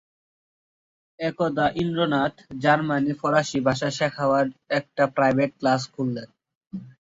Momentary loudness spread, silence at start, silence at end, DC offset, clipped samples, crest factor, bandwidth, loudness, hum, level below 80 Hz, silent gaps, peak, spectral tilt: 9 LU; 1.2 s; 0.15 s; under 0.1%; under 0.1%; 20 dB; 8 kHz; -23 LUFS; none; -58 dBFS; 6.55-6.61 s; -6 dBFS; -5.5 dB/octave